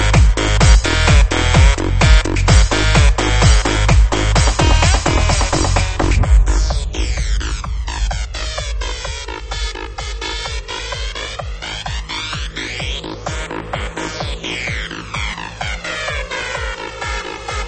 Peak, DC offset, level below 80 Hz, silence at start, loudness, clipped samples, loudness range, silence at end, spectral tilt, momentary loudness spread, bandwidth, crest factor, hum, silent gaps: 0 dBFS; under 0.1%; -18 dBFS; 0 s; -17 LUFS; under 0.1%; 11 LU; 0 s; -4 dB/octave; 12 LU; 8.8 kHz; 16 dB; none; none